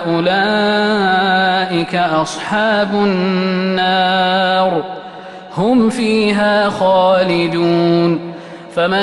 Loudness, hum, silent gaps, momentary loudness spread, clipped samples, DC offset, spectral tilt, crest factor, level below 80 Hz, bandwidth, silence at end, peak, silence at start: -14 LUFS; none; none; 9 LU; under 0.1%; under 0.1%; -5.5 dB/octave; 12 dB; -52 dBFS; 11.5 kHz; 0 s; -2 dBFS; 0 s